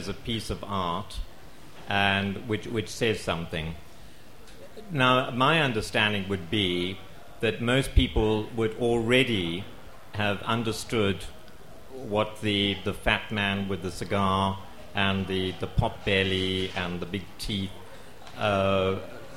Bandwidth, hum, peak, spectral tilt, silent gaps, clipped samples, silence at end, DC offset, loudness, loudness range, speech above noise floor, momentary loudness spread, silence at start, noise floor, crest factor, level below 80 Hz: 16.5 kHz; none; -8 dBFS; -5 dB/octave; none; under 0.1%; 0 s; 0.8%; -27 LUFS; 4 LU; 23 dB; 16 LU; 0 s; -50 dBFS; 20 dB; -40 dBFS